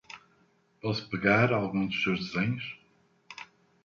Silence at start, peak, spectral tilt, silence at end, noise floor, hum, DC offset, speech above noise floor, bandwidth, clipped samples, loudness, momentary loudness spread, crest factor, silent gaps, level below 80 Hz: 0.1 s; -10 dBFS; -6.5 dB/octave; 0.4 s; -67 dBFS; none; under 0.1%; 39 dB; 7.4 kHz; under 0.1%; -28 LUFS; 24 LU; 22 dB; none; -62 dBFS